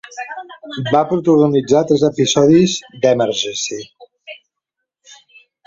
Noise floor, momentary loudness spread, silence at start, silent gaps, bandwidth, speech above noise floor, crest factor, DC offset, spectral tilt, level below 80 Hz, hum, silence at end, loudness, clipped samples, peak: -79 dBFS; 19 LU; 0.15 s; none; 7.8 kHz; 64 dB; 16 dB; under 0.1%; -5 dB/octave; -54 dBFS; none; 0.55 s; -15 LUFS; under 0.1%; 0 dBFS